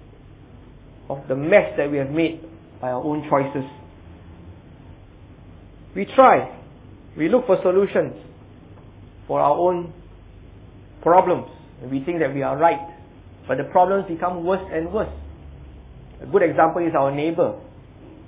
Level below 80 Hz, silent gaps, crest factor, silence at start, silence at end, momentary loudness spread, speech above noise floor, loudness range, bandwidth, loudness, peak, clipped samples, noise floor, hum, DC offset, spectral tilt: -48 dBFS; none; 22 dB; 0.6 s; 0.05 s; 21 LU; 25 dB; 6 LU; 4 kHz; -20 LUFS; -2 dBFS; under 0.1%; -45 dBFS; none; under 0.1%; -10.5 dB/octave